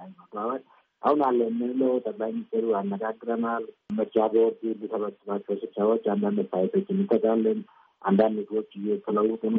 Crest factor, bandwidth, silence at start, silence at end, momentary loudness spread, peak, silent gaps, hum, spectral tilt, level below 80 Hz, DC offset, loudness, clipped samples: 16 dB; 4.3 kHz; 0 s; 0 s; 9 LU; -10 dBFS; none; none; -7.5 dB/octave; -76 dBFS; under 0.1%; -27 LUFS; under 0.1%